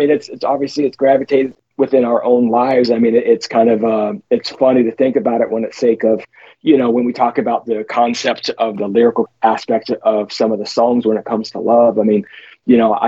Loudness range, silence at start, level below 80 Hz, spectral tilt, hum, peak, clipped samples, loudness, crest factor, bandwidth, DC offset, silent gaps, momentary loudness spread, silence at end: 2 LU; 0 s; -62 dBFS; -6 dB/octave; none; 0 dBFS; under 0.1%; -15 LUFS; 14 dB; 7.8 kHz; under 0.1%; none; 6 LU; 0 s